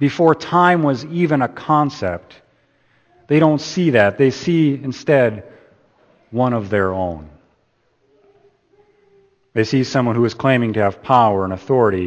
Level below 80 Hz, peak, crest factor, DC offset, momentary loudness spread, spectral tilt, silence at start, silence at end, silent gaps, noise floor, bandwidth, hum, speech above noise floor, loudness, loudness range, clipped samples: -54 dBFS; 0 dBFS; 18 dB; under 0.1%; 10 LU; -7 dB/octave; 0 s; 0 s; none; -62 dBFS; 8.4 kHz; none; 46 dB; -17 LUFS; 7 LU; under 0.1%